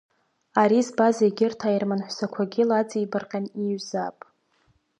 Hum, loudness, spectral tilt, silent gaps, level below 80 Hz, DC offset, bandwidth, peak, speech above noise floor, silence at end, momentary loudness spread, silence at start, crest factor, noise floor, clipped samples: none; -24 LUFS; -6 dB/octave; none; -76 dBFS; under 0.1%; 10.5 kHz; -6 dBFS; 43 dB; 0.9 s; 10 LU; 0.55 s; 20 dB; -66 dBFS; under 0.1%